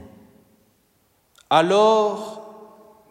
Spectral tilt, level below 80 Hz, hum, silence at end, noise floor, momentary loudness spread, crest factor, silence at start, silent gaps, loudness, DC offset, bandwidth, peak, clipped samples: -4.5 dB/octave; -70 dBFS; none; 0.6 s; -64 dBFS; 20 LU; 20 dB; 1.5 s; none; -18 LUFS; under 0.1%; 13 kHz; -4 dBFS; under 0.1%